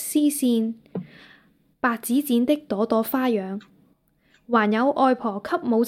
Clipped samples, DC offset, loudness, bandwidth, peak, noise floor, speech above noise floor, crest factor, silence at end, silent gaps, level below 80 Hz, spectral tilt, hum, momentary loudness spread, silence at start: under 0.1%; under 0.1%; -23 LUFS; 16.5 kHz; -6 dBFS; -63 dBFS; 40 dB; 18 dB; 0 s; none; -68 dBFS; -4.5 dB/octave; none; 12 LU; 0 s